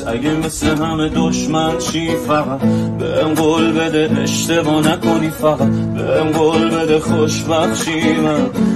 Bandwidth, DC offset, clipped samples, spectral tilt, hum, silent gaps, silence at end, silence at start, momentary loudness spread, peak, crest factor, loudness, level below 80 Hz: 13.5 kHz; 0.2%; under 0.1%; -5 dB/octave; none; none; 0 s; 0 s; 4 LU; -2 dBFS; 14 dB; -15 LUFS; -38 dBFS